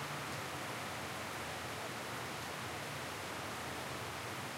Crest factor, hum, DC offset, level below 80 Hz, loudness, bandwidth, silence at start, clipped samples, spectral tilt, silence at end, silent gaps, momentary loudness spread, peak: 14 dB; none; under 0.1%; -68 dBFS; -42 LUFS; 16 kHz; 0 s; under 0.1%; -3 dB/octave; 0 s; none; 1 LU; -30 dBFS